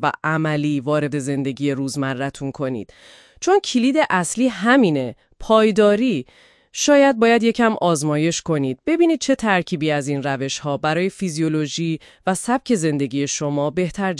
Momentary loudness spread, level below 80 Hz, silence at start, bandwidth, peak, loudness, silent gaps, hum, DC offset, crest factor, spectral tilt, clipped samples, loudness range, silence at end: 10 LU; -52 dBFS; 0 s; 12 kHz; -2 dBFS; -19 LUFS; none; none; under 0.1%; 16 dB; -5 dB/octave; under 0.1%; 5 LU; 0 s